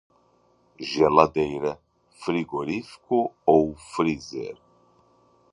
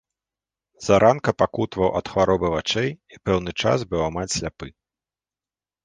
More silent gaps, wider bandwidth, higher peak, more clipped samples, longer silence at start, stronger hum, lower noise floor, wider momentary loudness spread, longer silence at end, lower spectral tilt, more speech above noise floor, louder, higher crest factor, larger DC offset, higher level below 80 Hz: neither; about the same, 11 kHz vs 10 kHz; about the same, 0 dBFS vs -2 dBFS; neither; about the same, 0.8 s vs 0.8 s; neither; second, -63 dBFS vs under -90 dBFS; about the same, 16 LU vs 14 LU; second, 1 s vs 1.15 s; about the same, -6 dB/octave vs -5 dB/octave; second, 39 dB vs over 68 dB; about the same, -24 LUFS vs -22 LUFS; about the same, 24 dB vs 20 dB; neither; second, -56 dBFS vs -46 dBFS